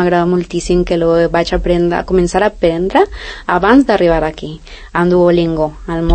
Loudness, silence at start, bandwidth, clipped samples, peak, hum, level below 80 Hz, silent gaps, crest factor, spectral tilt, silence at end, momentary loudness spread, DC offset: -13 LUFS; 0 s; 8.8 kHz; under 0.1%; 0 dBFS; none; -28 dBFS; none; 12 dB; -6.5 dB/octave; 0 s; 10 LU; under 0.1%